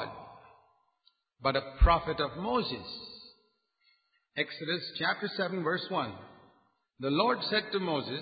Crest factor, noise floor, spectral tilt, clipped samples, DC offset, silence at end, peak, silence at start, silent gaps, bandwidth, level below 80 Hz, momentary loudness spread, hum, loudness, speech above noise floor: 22 dB; -73 dBFS; -9 dB/octave; under 0.1%; under 0.1%; 0 s; -10 dBFS; 0 s; none; 5 kHz; -40 dBFS; 15 LU; none; -31 LUFS; 43 dB